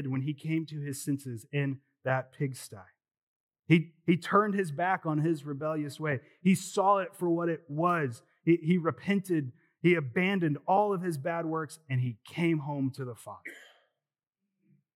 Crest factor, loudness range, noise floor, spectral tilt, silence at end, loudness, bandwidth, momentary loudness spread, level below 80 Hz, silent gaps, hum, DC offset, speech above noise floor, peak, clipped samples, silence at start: 22 dB; 6 LU; under -90 dBFS; -6.5 dB/octave; 1.3 s; -30 LUFS; 14.5 kHz; 10 LU; -88 dBFS; 3.18-3.49 s; none; under 0.1%; over 60 dB; -8 dBFS; under 0.1%; 0 s